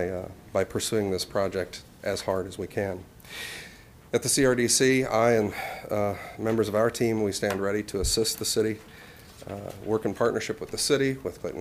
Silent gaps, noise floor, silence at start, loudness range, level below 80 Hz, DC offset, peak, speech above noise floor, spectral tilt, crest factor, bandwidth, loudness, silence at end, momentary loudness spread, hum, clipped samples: none; -48 dBFS; 0 s; 6 LU; -48 dBFS; under 0.1%; -8 dBFS; 21 dB; -4 dB/octave; 20 dB; 16 kHz; -27 LUFS; 0 s; 16 LU; none; under 0.1%